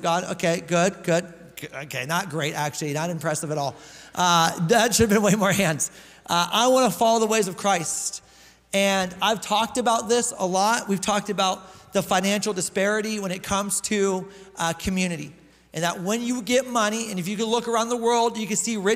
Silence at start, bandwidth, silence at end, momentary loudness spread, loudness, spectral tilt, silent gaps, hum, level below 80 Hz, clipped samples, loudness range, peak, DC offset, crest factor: 0 s; 16 kHz; 0 s; 10 LU; -23 LUFS; -3.5 dB/octave; none; none; -54 dBFS; under 0.1%; 5 LU; -6 dBFS; under 0.1%; 18 dB